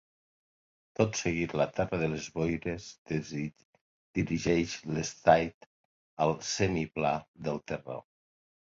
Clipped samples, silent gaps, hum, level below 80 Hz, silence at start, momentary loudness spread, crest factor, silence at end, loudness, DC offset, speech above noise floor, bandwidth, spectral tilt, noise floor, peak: under 0.1%; 2.98-3.05 s, 3.65-3.73 s, 3.81-4.14 s, 5.54-6.17 s, 7.28-7.34 s; none; -54 dBFS; 1 s; 11 LU; 24 dB; 0.7 s; -31 LUFS; under 0.1%; over 59 dB; 7.8 kHz; -5 dB/octave; under -90 dBFS; -8 dBFS